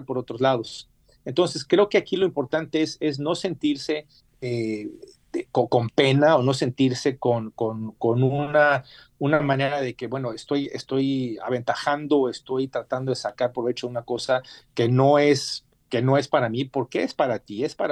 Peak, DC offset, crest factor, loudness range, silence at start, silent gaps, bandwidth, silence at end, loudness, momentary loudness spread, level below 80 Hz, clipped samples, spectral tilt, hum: -4 dBFS; under 0.1%; 18 dB; 4 LU; 0 s; none; 11.5 kHz; 0 s; -24 LUFS; 11 LU; -64 dBFS; under 0.1%; -6 dB/octave; none